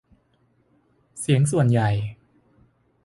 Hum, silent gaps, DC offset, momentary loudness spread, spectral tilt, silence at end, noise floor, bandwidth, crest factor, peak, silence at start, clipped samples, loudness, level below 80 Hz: none; none; under 0.1%; 15 LU; -6.5 dB/octave; 0.9 s; -64 dBFS; 11.5 kHz; 18 dB; -8 dBFS; 1.15 s; under 0.1%; -22 LUFS; -54 dBFS